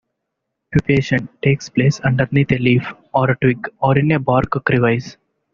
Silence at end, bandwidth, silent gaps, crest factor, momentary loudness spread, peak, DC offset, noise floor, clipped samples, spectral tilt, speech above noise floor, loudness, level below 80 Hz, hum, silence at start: 0.45 s; 7.2 kHz; none; 16 dB; 5 LU; -2 dBFS; under 0.1%; -77 dBFS; under 0.1%; -6.5 dB/octave; 60 dB; -17 LUFS; -44 dBFS; none; 0.7 s